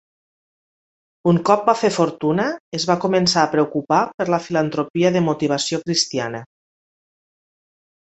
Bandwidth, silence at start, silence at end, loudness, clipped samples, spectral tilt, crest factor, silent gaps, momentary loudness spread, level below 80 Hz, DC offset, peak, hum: 8.2 kHz; 1.25 s; 1.55 s; -19 LUFS; under 0.1%; -5 dB/octave; 20 dB; 2.60-2.72 s, 4.14-4.18 s, 4.90-4.94 s; 7 LU; -60 dBFS; under 0.1%; 0 dBFS; none